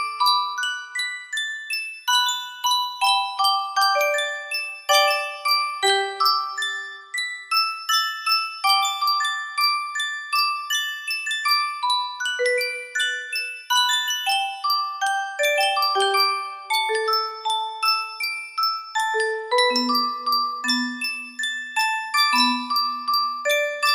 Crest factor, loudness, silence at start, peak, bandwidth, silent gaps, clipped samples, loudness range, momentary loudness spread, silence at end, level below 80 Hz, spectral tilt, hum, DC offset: 18 dB; -21 LUFS; 0 s; -4 dBFS; 16 kHz; none; under 0.1%; 2 LU; 7 LU; 0 s; -78 dBFS; 1.5 dB/octave; none; under 0.1%